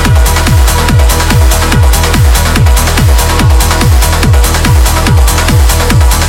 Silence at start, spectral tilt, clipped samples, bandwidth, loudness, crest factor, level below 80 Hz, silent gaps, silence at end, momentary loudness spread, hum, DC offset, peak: 0 s; -4.5 dB/octave; 0.5%; 17 kHz; -7 LUFS; 6 dB; -8 dBFS; none; 0 s; 0 LU; none; under 0.1%; 0 dBFS